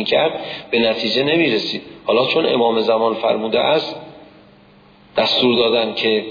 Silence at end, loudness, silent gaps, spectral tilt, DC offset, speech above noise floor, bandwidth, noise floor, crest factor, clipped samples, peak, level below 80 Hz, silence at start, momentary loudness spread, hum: 0 s; -17 LUFS; none; -5.5 dB/octave; under 0.1%; 31 dB; 5.2 kHz; -48 dBFS; 14 dB; under 0.1%; -4 dBFS; -58 dBFS; 0 s; 9 LU; none